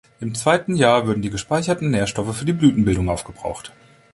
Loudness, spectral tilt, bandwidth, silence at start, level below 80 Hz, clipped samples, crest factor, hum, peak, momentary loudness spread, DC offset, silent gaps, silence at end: -20 LUFS; -5.5 dB/octave; 11.5 kHz; 0.2 s; -40 dBFS; under 0.1%; 18 dB; none; -2 dBFS; 14 LU; under 0.1%; none; 0.45 s